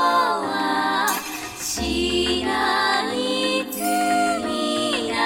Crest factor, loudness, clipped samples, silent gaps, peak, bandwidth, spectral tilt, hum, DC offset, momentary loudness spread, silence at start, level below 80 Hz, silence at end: 14 dB; -22 LUFS; under 0.1%; none; -8 dBFS; 17 kHz; -2.5 dB/octave; none; under 0.1%; 4 LU; 0 s; -44 dBFS; 0 s